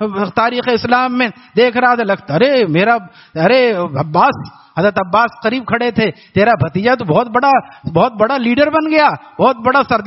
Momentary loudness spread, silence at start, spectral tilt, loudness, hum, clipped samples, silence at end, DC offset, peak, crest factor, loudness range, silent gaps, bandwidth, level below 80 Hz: 5 LU; 0 s; -4 dB/octave; -13 LUFS; none; under 0.1%; 0 s; under 0.1%; 0 dBFS; 14 dB; 1 LU; none; 6 kHz; -50 dBFS